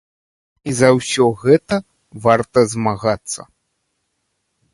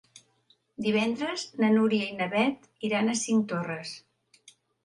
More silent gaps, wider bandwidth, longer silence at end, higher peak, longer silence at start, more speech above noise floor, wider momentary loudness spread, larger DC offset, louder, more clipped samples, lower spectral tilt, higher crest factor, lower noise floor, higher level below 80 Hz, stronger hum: neither; about the same, 11.5 kHz vs 11.5 kHz; first, 1.3 s vs 0.85 s; first, 0 dBFS vs -12 dBFS; first, 0.65 s vs 0.15 s; first, 55 dB vs 40 dB; about the same, 11 LU vs 12 LU; neither; first, -17 LUFS vs -27 LUFS; neither; about the same, -5 dB/octave vs -4.5 dB/octave; about the same, 18 dB vs 18 dB; about the same, -71 dBFS vs -68 dBFS; first, -52 dBFS vs -74 dBFS; neither